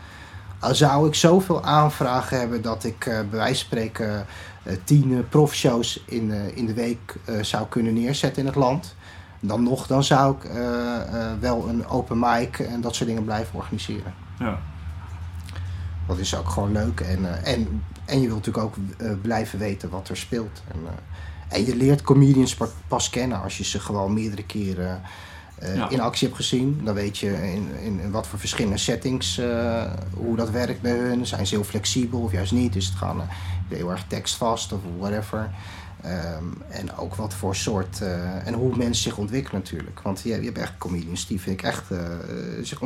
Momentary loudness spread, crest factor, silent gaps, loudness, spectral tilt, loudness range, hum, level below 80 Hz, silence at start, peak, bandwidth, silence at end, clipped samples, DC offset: 13 LU; 22 dB; none; -24 LUFS; -5.5 dB/octave; 7 LU; none; -42 dBFS; 0 s; -2 dBFS; 16 kHz; 0 s; under 0.1%; under 0.1%